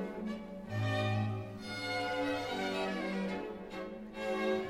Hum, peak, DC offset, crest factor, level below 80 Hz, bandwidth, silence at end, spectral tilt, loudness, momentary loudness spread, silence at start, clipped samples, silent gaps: none; -22 dBFS; under 0.1%; 14 dB; -62 dBFS; 15 kHz; 0 s; -6 dB/octave; -37 LUFS; 9 LU; 0 s; under 0.1%; none